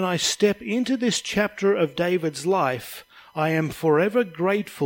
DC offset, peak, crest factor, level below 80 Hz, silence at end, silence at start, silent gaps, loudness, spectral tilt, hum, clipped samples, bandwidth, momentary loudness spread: under 0.1%; -8 dBFS; 16 dB; -60 dBFS; 0 s; 0 s; none; -23 LUFS; -4.5 dB/octave; none; under 0.1%; 17 kHz; 6 LU